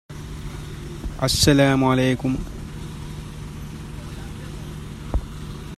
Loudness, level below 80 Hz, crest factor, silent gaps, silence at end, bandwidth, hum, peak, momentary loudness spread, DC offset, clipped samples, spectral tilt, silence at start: -20 LUFS; -34 dBFS; 24 dB; none; 0 s; 15 kHz; none; 0 dBFS; 19 LU; under 0.1%; under 0.1%; -5 dB/octave; 0.1 s